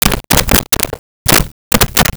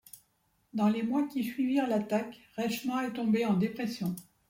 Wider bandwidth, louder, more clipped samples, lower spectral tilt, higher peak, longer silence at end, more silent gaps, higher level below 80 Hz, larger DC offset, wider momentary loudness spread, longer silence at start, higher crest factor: first, over 20 kHz vs 16.5 kHz; first, -11 LUFS vs -31 LUFS; neither; second, -2.5 dB/octave vs -6.5 dB/octave; first, 0 dBFS vs -16 dBFS; second, 0 s vs 0.25 s; first, 0.99-1.25 s, 1.52-1.71 s vs none; first, -22 dBFS vs -72 dBFS; neither; about the same, 6 LU vs 8 LU; second, 0 s vs 0.15 s; about the same, 12 dB vs 16 dB